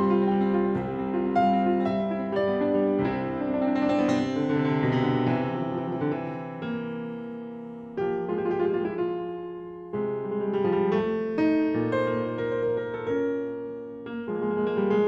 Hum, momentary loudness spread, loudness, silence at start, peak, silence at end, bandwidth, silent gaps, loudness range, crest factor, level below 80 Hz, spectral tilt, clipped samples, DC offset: none; 11 LU; -27 LUFS; 0 s; -12 dBFS; 0 s; 8 kHz; none; 5 LU; 14 dB; -58 dBFS; -8.5 dB/octave; under 0.1%; under 0.1%